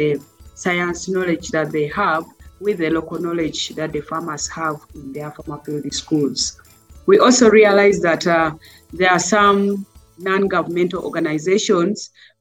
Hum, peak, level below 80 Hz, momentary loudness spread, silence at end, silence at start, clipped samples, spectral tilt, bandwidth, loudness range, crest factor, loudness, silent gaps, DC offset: none; -2 dBFS; -48 dBFS; 16 LU; 0.35 s; 0 s; under 0.1%; -4 dB/octave; 15.5 kHz; 9 LU; 18 dB; -18 LUFS; none; under 0.1%